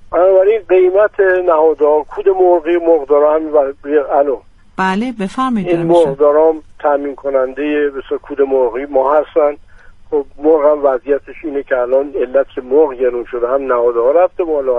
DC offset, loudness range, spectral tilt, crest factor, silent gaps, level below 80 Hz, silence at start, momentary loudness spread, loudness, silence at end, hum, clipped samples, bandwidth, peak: under 0.1%; 4 LU; -7.5 dB/octave; 12 dB; none; -44 dBFS; 0 s; 8 LU; -13 LUFS; 0 s; none; under 0.1%; 10.5 kHz; 0 dBFS